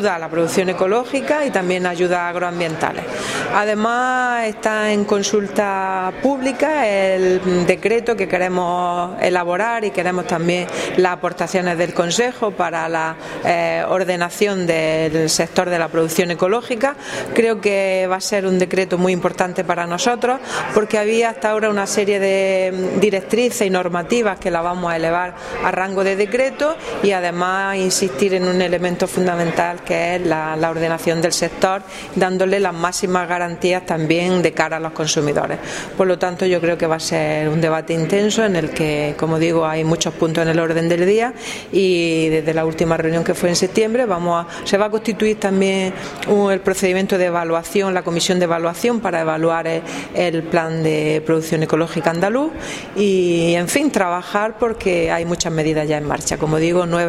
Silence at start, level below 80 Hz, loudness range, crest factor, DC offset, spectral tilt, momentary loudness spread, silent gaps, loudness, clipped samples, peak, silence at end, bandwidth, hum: 0 s; -48 dBFS; 1 LU; 18 dB; under 0.1%; -4.5 dB/octave; 4 LU; none; -18 LUFS; under 0.1%; 0 dBFS; 0 s; 15.5 kHz; none